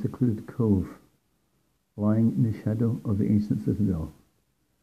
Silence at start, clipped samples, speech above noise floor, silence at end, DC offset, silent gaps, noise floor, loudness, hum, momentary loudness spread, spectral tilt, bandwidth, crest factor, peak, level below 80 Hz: 0 s; under 0.1%; 46 dB; 0.7 s; under 0.1%; none; -71 dBFS; -26 LUFS; none; 8 LU; -10.5 dB/octave; 9.8 kHz; 16 dB; -10 dBFS; -54 dBFS